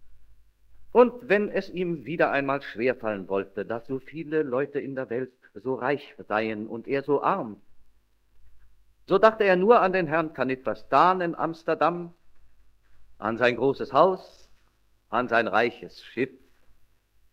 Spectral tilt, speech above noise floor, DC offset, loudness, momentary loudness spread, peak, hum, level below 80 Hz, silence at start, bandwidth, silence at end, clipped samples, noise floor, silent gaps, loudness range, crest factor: -7 dB/octave; 38 dB; under 0.1%; -25 LUFS; 13 LU; -2 dBFS; none; -62 dBFS; 0 s; 7.6 kHz; 0.6 s; under 0.1%; -63 dBFS; none; 7 LU; 24 dB